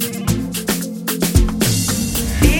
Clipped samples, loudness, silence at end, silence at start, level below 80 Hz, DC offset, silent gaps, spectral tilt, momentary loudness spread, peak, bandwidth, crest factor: under 0.1%; -18 LUFS; 0 s; 0 s; -22 dBFS; under 0.1%; none; -4.5 dB/octave; 5 LU; 0 dBFS; 17 kHz; 16 dB